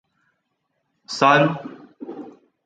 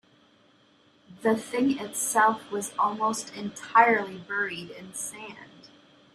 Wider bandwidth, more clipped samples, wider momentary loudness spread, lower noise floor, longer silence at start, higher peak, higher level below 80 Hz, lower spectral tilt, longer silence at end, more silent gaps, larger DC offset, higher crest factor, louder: second, 9.2 kHz vs 15.5 kHz; neither; first, 24 LU vs 16 LU; first, -74 dBFS vs -61 dBFS; about the same, 1.1 s vs 1.1 s; first, -2 dBFS vs -6 dBFS; about the same, -72 dBFS vs -74 dBFS; first, -5 dB/octave vs -3 dB/octave; second, 0.35 s vs 0.7 s; neither; neither; about the same, 22 dB vs 22 dB; first, -17 LUFS vs -26 LUFS